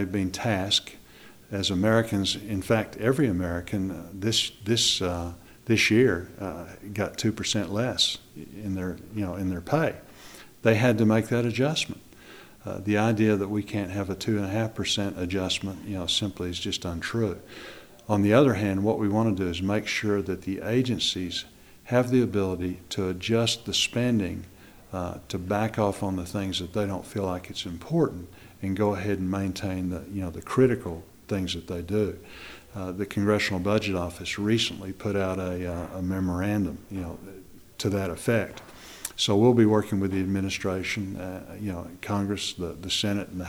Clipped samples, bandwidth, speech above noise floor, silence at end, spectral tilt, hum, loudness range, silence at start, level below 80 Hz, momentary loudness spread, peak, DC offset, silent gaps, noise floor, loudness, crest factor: under 0.1%; over 20 kHz; 24 dB; 0 s; -5 dB/octave; none; 4 LU; 0 s; -52 dBFS; 14 LU; -6 dBFS; under 0.1%; none; -50 dBFS; -27 LUFS; 22 dB